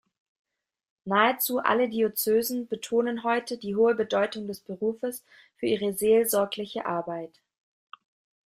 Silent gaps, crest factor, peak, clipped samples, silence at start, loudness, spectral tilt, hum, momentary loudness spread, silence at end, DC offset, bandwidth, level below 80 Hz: none; 20 dB; -6 dBFS; under 0.1%; 1.05 s; -26 LUFS; -4 dB/octave; none; 13 LU; 1.2 s; under 0.1%; 16 kHz; -70 dBFS